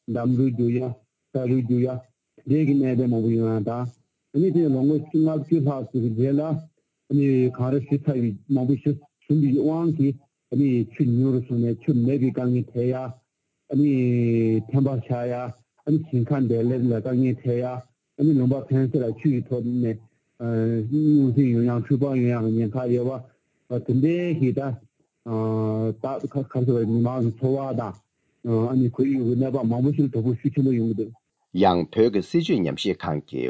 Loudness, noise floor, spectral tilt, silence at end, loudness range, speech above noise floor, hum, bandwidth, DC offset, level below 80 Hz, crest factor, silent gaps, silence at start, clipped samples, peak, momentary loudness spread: -23 LUFS; -74 dBFS; -9.5 dB/octave; 0 s; 3 LU; 52 dB; none; 8 kHz; under 0.1%; -58 dBFS; 16 dB; none; 0.1 s; under 0.1%; -6 dBFS; 9 LU